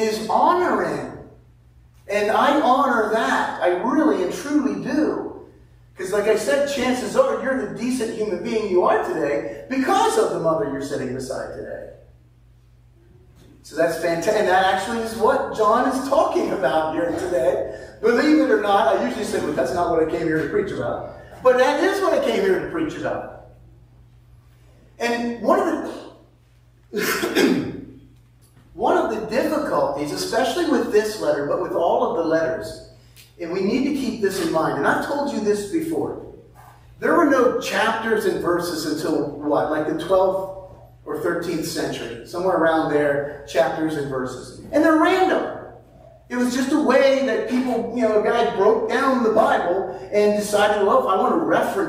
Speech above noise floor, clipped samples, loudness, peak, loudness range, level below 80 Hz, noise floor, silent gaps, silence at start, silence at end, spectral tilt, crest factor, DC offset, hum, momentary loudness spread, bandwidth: 33 dB; under 0.1%; -21 LUFS; -2 dBFS; 5 LU; -52 dBFS; -53 dBFS; none; 0 s; 0 s; -4.5 dB/octave; 18 dB; under 0.1%; none; 11 LU; 16 kHz